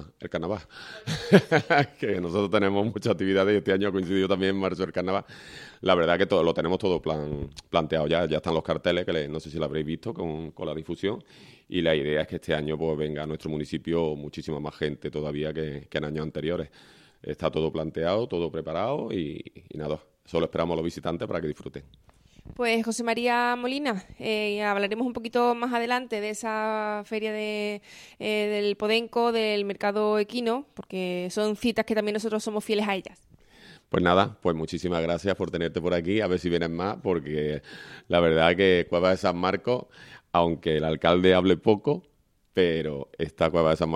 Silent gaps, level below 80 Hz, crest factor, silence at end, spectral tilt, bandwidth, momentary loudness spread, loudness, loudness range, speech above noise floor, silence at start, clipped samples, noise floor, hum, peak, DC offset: none; -52 dBFS; 24 dB; 0 s; -6 dB/octave; 14 kHz; 11 LU; -27 LUFS; 6 LU; 26 dB; 0 s; under 0.1%; -53 dBFS; none; -2 dBFS; under 0.1%